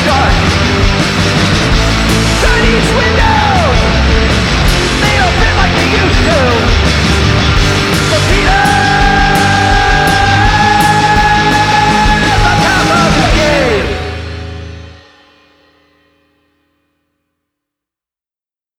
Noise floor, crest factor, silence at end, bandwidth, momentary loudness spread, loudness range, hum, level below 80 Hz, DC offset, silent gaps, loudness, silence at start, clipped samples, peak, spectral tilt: under -90 dBFS; 10 dB; 3.85 s; 16 kHz; 2 LU; 5 LU; none; -18 dBFS; under 0.1%; none; -9 LUFS; 0 s; under 0.1%; 0 dBFS; -4.5 dB/octave